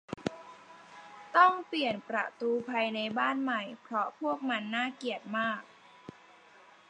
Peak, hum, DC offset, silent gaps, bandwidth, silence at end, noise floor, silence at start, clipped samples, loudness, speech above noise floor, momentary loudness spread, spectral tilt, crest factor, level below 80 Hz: -8 dBFS; none; under 0.1%; none; 9.8 kHz; 0.8 s; -58 dBFS; 0.1 s; under 0.1%; -31 LUFS; 27 dB; 26 LU; -5 dB/octave; 24 dB; -76 dBFS